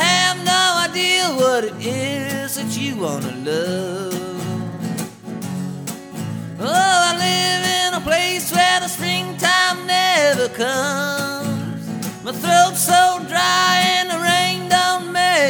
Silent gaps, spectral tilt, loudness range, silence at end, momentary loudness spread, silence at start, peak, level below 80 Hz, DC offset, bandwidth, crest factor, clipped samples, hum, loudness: none; -2.5 dB/octave; 8 LU; 0 s; 13 LU; 0 s; -2 dBFS; -58 dBFS; under 0.1%; over 20 kHz; 18 dB; under 0.1%; none; -17 LUFS